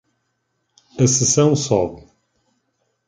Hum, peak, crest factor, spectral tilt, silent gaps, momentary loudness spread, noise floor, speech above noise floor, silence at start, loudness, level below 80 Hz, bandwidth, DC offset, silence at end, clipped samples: none; -2 dBFS; 18 dB; -4.5 dB/octave; none; 11 LU; -71 dBFS; 55 dB; 0.95 s; -17 LUFS; -50 dBFS; 10 kHz; under 0.1%; 1.1 s; under 0.1%